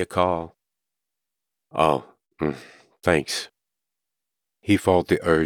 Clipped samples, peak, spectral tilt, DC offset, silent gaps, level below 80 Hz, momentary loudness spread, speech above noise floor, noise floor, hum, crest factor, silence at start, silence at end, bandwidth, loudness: under 0.1%; -4 dBFS; -5.5 dB/octave; under 0.1%; none; -52 dBFS; 16 LU; 64 dB; -86 dBFS; none; 22 dB; 0 s; 0 s; 18.5 kHz; -23 LUFS